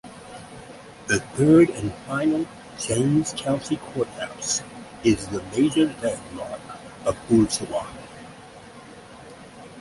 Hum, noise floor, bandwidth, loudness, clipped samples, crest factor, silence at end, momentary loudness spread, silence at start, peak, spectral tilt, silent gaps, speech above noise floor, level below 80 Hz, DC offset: none; -44 dBFS; 11.5 kHz; -23 LUFS; under 0.1%; 20 dB; 0 s; 23 LU; 0.05 s; -6 dBFS; -5 dB/octave; none; 21 dB; -52 dBFS; under 0.1%